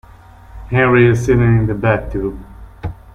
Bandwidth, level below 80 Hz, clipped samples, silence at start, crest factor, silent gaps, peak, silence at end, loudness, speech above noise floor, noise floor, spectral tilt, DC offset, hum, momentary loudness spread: 8.8 kHz; -32 dBFS; under 0.1%; 0.55 s; 14 dB; none; -2 dBFS; 0.2 s; -14 LUFS; 27 dB; -40 dBFS; -8 dB/octave; under 0.1%; none; 19 LU